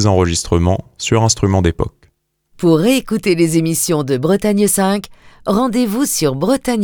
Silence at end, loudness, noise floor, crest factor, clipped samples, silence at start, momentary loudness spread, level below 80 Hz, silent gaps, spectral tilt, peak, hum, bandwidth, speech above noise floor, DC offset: 0 s; -15 LUFS; -58 dBFS; 14 dB; under 0.1%; 0 s; 5 LU; -34 dBFS; none; -5 dB/octave; 0 dBFS; none; over 20 kHz; 44 dB; under 0.1%